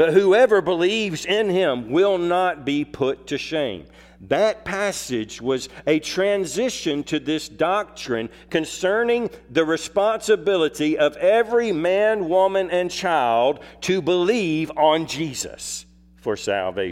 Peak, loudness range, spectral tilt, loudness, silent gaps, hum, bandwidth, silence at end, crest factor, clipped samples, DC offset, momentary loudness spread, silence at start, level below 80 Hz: -4 dBFS; 4 LU; -4 dB/octave; -21 LUFS; none; none; 15.5 kHz; 0 s; 18 dB; under 0.1%; under 0.1%; 8 LU; 0 s; -54 dBFS